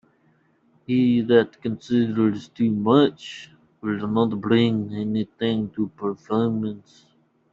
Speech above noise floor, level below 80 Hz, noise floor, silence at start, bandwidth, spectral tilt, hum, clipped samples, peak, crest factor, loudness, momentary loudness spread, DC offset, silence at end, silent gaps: 40 dB; -62 dBFS; -62 dBFS; 0.9 s; 7.4 kHz; -8 dB/octave; none; under 0.1%; -4 dBFS; 18 dB; -22 LUFS; 12 LU; under 0.1%; 0.75 s; none